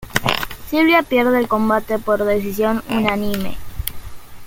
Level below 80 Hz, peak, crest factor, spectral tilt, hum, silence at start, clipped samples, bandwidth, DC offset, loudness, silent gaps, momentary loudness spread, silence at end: -38 dBFS; 0 dBFS; 18 dB; -5 dB/octave; none; 0 s; under 0.1%; 17 kHz; under 0.1%; -18 LUFS; none; 14 LU; 0 s